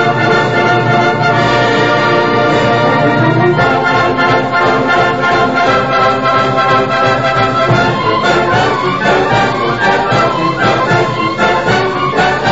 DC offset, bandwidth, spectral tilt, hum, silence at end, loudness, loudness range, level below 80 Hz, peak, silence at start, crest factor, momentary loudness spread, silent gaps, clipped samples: 1%; 8 kHz; -5.5 dB/octave; none; 0 s; -11 LUFS; 1 LU; -40 dBFS; 0 dBFS; 0 s; 10 dB; 2 LU; none; under 0.1%